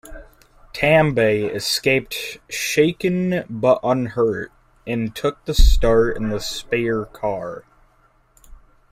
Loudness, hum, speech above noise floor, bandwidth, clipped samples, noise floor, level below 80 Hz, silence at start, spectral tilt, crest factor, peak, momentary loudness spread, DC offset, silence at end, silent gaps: -20 LUFS; none; 39 dB; 16 kHz; under 0.1%; -57 dBFS; -26 dBFS; 0.05 s; -5 dB/octave; 18 dB; -2 dBFS; 12 LU; under 0.1%; 0.35 s; none